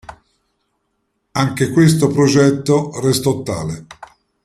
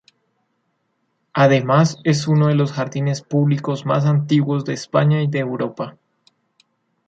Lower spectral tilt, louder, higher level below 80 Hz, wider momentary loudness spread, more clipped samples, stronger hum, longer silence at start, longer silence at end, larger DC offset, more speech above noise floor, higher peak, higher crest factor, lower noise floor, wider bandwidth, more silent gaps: about the same, -6 dB/octave vs -7 dB/octave; first, -15 LUFS vs -18 LUFS; first, -50 dBFS vs -62 dBFS; first, 12 LU vs 9 LU; neither; neither; second, 0.1 s vs 1.35 s; second, 0.4 s vs 1.15 s; neither; about the same, 55 dB vs 52 dB; about the same, -2 dBFS vs -2 dBFS; about the same, 16 dB vs 18 dB; about the same, -69 dBFS vs -69 dBFS; first, 15 kHz vs 7.8 kHz; neither